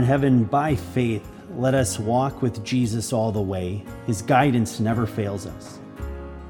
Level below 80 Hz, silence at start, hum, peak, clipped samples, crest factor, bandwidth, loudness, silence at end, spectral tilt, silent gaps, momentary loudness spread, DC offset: -44 dBFS; 0 s; none; -4 dBFS; under 0.1%; 18 dB; 18.5 kHz; -23 LUFS; 0 s; -6.5 dB/octave; none; 16 LU; under 0.1%